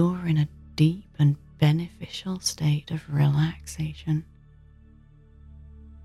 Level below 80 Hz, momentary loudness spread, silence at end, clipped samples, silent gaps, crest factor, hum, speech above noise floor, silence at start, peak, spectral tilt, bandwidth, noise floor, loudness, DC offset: -50 dBFS; 10 LU; 0 s; under 0.1%; none; 18 dB; none; 28 dB; 0 s; -8 dBFS; -6 dB/octave; 12.5 kHz; -52 dBFS; -26 LUFS; under 0.1%